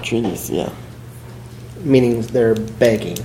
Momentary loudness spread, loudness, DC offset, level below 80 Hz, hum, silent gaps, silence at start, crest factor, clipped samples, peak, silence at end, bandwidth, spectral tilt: 21 LU; -18 LUFS; under 0.1%; -44 dBFS; none; none; 0 s; 18 dB; under 0.1%; 0 dBFS; 0 s; 16.5 kHz; -6 dB/octave